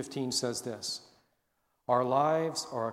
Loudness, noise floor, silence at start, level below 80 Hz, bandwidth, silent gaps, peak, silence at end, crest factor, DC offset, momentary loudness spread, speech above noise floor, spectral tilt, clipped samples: -31 LUFS; -78 dBFS; 0 s; -74 dBFS; 16 kHz; none; -14 dBFS; 0 s; 18 dB; under 0.1%; 10 LU; 47 dB; -4 dB/octave; under 0.1%